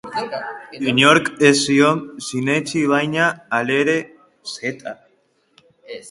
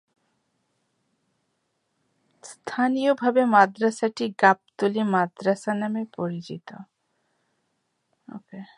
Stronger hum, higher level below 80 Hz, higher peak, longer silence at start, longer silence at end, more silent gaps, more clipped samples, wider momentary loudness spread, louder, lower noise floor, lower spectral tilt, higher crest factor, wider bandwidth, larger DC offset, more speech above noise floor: neither; first, -62 dBFS vs -78 dBFS; about the same, 0 dBFS vs -2 dBFS; second, 0.05 s vs 2.45 s; second, 0 s vs 0.15 s; neither; neither; about the same, 19 LU vs 21 LU; first, -18 LUFS vs -23 LUFS; second, -62 dBFS vs -75 dBFS; second, -4 dB/octave vs -6 dB/octave; about the same, 20 dB vs 24 dB; about the same, 11.5 kHz vs 11.5 kHz; neither; second, 44 dB vs 51 dB